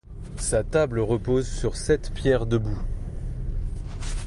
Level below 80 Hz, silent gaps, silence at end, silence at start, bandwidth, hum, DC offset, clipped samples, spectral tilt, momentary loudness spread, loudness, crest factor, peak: -32 dBFS; none; 0 s; 0.05 s; 11.5 kHz; none; under 0.1%; under 0.1%; -6 dB/octave; 12 LU; -26 LUFS; 16 dB; -8 dBFS